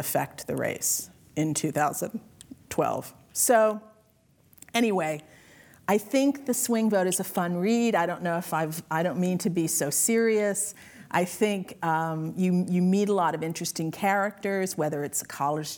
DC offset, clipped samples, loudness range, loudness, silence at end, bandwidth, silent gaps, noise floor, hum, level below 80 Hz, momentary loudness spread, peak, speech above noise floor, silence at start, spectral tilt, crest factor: under 0.1%; under 0.1%; 2 LU; -26 LUFS; 0 s; over 20 kHz; none; -63 dBFS; none; -68 dBFS; 8 LU; -8 dBFS; 36 dB; 0 s; -4.5 dB/octave; 18 dB